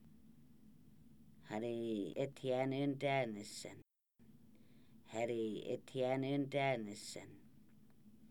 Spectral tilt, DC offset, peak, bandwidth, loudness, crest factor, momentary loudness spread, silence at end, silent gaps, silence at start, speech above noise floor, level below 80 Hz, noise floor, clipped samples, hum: -6 dB/octave; under 0.1%; -24 dBFS; 19.5 kHz; -41 LUFS; 18 dB; 13 LU; 0.05 s; none; 0.05 s; 26 dB; -78 dBFS; -67 dBFS; under 0.1%; none